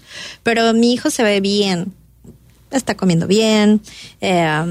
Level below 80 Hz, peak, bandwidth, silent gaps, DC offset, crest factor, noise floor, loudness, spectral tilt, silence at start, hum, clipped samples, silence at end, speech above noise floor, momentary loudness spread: -50 dBFS; -4 dBFS; 15.5 kHz; none; under 0.1%; 14 dB; -44 dBFS; -16 LUFS; -5 dB/octave; 0.1 s; none; under 0.1%; 0 s; 29 dB; 10 LU